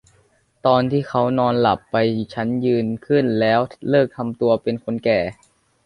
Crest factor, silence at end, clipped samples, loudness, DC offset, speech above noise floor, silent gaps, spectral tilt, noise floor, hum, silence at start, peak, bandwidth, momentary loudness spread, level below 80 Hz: 18 dB; 0.55 s; under 0.1%; -20 LUFS; under 0.1%; 40 dB; none; -8 dB/octave; -59 dBFS; none; 0.65 s; -2 dBFS; 10.5 kHz; 6 LU; -54 dBFS